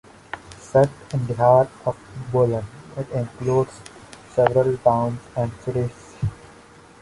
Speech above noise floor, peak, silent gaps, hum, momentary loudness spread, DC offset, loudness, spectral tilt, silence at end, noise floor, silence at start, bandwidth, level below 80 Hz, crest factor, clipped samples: 27 dB; -2 dBFS; none; none; 17 LU; under 0.1%; -22 LUFS; -8 dB/octave; 0.65 s; -47 dBFS; 0.35 s; 11.5 kHz; -48 dBFS; 20 dB; under 0.1%